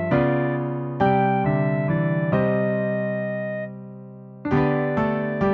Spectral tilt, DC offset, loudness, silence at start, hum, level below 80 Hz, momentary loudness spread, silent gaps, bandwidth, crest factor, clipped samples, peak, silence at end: -10 dB/octave; under 0.1%; -22 LUFS; 0 s; none; -48 dBFS; 13 LU; none; 5.2 kHz; 16 dB; under 0.1%; -6 dBFS; 0 s